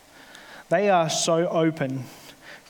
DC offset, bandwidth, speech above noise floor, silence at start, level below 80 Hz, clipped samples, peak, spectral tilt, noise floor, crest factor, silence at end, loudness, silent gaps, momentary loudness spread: under 0.1%; 19 kHz; 25 dB; 0.35 s; -70 dBFS; under 0.1%; -8 dBFS; -4 dB/octave; -47 dBFS; 16 dB; 0.1 s; -23 LUFS; none; 23 LU